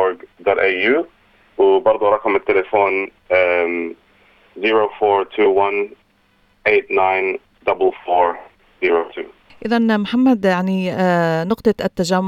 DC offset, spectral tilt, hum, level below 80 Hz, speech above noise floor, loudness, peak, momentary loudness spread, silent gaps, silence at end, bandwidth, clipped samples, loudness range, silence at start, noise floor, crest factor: under 0.1%; -6 dB/octave; none; -54 dBFS; 42 dB; -17 LUFS; -2 dBFS; 9 LU; none; 0 s; 13.5 kHz; under 0.1%; 2 LU; 0 s; -58 dBFS; 16 dB